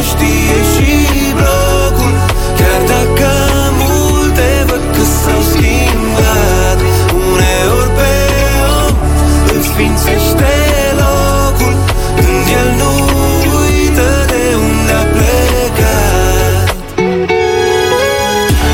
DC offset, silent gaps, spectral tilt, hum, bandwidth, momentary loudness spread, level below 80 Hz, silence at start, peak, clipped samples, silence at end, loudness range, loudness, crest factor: under 0.1%; none; -5 dB/octave; none; 17 kHz; 2 LU; -14 dBFS; 0 s; 0 dBFS; under 0.1%; 0 s; 1 LU; -10 LUFS; 10 dB